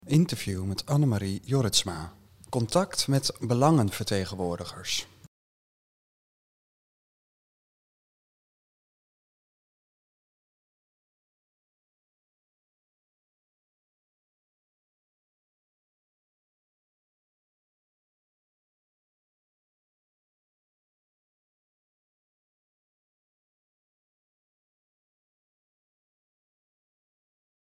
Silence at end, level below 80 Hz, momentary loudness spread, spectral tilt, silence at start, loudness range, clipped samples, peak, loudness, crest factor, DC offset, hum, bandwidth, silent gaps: 22.65 s; -64 dBFS; 11 LU; -5 dB/octave; 0.05 s; 11 LU; under 0.1%; -8 dBFS; -27 LUFS; 26 dB; 0.2%; none; 16 kHz; none